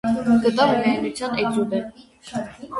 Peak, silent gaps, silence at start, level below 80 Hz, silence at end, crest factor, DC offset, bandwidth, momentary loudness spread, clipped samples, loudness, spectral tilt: -4 dBFS; none; 0.05 s; -54 dBFS; 0 s; 16 dB; under 0.1%; 11.5 kHz; 13 LU; under 0.1%; -21 LUFS; -5.5 dB/octave